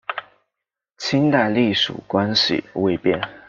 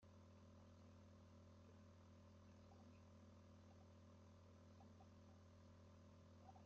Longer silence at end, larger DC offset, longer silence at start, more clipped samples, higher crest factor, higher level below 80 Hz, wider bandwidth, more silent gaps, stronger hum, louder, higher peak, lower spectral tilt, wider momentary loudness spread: about the same, 0.1 s vs 0 s; neither; about the same, 0.1 s vs 0 s; neither; about the same, 18 dB vs 14 dB; first, -58 dBFS vs -86 dBFS; about the same, 7.6 kHz vs 7.2 kHz; neither; neither; first, -19 LUFS vs -68 LUFS; first, -4 dBFS vs -52 dBFS; second, -5 dB/octave vs -6.5 dB/octave; first, 8 LU vs 1 LU